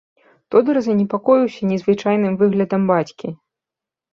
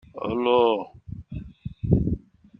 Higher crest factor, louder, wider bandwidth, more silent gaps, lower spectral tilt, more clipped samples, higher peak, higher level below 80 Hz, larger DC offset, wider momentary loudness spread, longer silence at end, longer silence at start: about the same, 16 dB vs 20 dB; first, -18 LUFS vs -24 LUFS; first, 7 kHz vs 5.2 kHz; neither; second, -8 dB/octave vs -10 dB/octave; neither; first, -2 dBFS vs -6 dBFS; second, -62 dBFS vs -40 dBFS; neither; second, 5 LU vs 19 LU; first, 0.75 s vs 0.4 s; first, 0.5 s vs 0.15 s